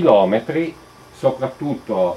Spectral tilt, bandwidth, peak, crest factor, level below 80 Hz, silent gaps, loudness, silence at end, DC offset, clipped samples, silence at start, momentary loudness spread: -7.5 dB/octave; 12 kHz; 0 dBFS; 18 dB; -56 dBFS; none; -20 LUFS; 0 s; under 0.1%; under 0.1%; 0 s; 11 LU